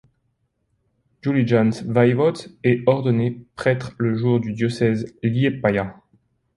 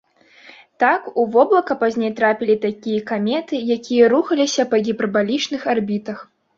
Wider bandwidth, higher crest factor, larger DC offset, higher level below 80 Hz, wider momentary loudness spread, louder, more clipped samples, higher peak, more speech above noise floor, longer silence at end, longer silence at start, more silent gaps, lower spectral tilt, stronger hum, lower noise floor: first, 11 kHz vs 7.6 kHz; about the same, 18 dB vs 16 dB; neither; first, -54 dBFS vs -64 dBFS; about the same, 6 LU vs 8 LU; second, -21 LUFS vs -18 LUFS; neither; about the same, -2 dBFS vs -2 dBFS; first, 50 dB vs 29 dB; first, 0.65 s vs 0.35 s; first, 1.25 s vs 0.8 s; neither; first, -8 dB/octave vs -4.5 dB/octave; neither; first, -70 dBFS vs -47 dBFS